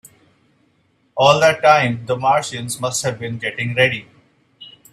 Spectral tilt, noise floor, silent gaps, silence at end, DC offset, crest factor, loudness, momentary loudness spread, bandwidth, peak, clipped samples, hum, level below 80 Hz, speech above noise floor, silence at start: -3.5 dB/octave; -61 dBFS; none; 0.25 s; under 0.1%; 20 dB; -17 LUFS; 12 LU; 14.5 kHz; 0 dBFS; under 0.1%; none; -58 dBFS; 44 dB; 1.15 s